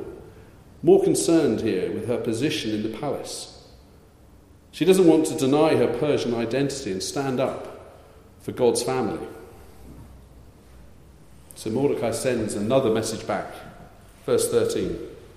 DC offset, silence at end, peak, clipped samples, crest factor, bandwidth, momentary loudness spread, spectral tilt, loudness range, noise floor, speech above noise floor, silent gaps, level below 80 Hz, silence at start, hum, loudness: under 0.1%; 0.1 s; -4 dBFS; under 0.1%; 20 dB; 15 kHz; 19 LU; -5 dB/octave; 8 LU; -51 dBFS; 29 dB; none; -52 dBFS; 0 s; none; -23 LUFS